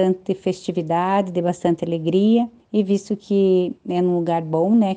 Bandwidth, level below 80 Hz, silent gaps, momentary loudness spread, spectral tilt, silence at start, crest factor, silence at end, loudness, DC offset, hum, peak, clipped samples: 9.2 kHz; -62 dBFS; none; 6 LU; -7.5 dB/octave; 0 s; 14 dB; 0 s; -20 LUFS; under 0.1%; none; -4 dBFS; under 0.1%